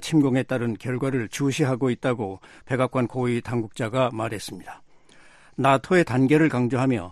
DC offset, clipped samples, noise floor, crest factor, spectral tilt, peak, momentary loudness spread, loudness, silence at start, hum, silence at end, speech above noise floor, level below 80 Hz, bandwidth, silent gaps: under 0.1%; under 0.1%; -51 dBFS; 20 dB; -6.5 dB/octave; -4 dBFS; 13 LU; -24 LUFS; 0 s; none; 0 s; 28 dB; -58 dBFS; 13 kHz; none